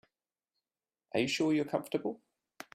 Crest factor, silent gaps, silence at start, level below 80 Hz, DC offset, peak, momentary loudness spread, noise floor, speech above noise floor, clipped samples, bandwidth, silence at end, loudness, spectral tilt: 20 dB; none; 1.15 s; -74 dBFS; under 0.1%; -16 dBFS; 16 LU; under -90 dBFS; over 58 dB; under 0.1%; 15.5 kHz; 0.6 s; -33 LUFS; -4.5 dB/octave